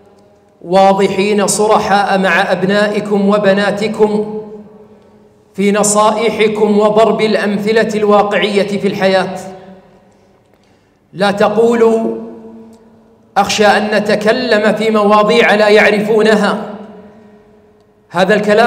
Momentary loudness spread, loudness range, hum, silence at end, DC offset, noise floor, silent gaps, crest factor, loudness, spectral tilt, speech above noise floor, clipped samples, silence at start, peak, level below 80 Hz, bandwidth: 10 LU; 6 LU; none; 0 s; under 0.1%; -51 dBFS; none; 12 dB; -11 LUFS; -4.5 dB/octave; 40 dB; under 0.1%; 0.65 s; 0 dBFS; -54 dBFS; 15.5 kHz